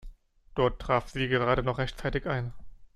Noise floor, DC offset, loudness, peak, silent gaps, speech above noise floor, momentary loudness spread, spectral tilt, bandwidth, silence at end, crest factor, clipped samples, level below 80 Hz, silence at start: -50 dBFS; under 0.1%; -29 LUFS; -10 dBFS; none; 22 dB; 8 LU; -6.5 dB/octave; 12 kHz; 0.1 s; 18 dB; under 0.1%; -44 dBFS; 0.05 s